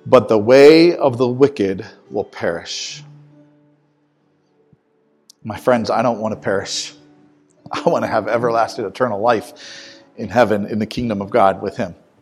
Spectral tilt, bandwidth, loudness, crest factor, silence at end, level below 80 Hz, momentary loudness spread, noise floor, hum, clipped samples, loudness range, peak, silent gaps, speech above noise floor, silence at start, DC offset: -5.5 dB/octave; 13.5 kHz; -16 LUFS; 18 dB; 0.3 s; -54 dBFS; 17 LU; -61 dBFS; none; 0.1%; 14 LU; 0 dBFS; none; 45 dB; 0.05 s; under 0.1%